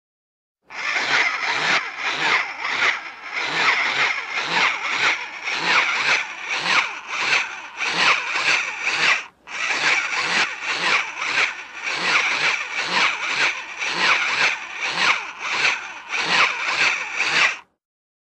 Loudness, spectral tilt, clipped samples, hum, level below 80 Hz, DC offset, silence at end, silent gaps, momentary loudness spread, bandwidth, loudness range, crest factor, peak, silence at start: -20 LUFS; 0 dB/octave; under 0.1%; none; -70 dBFS; under 0.1%; 0.7 s; none; 8 LU; 12 kHz; 1 LU; 18 dB; -4 dBFS; 0.7 s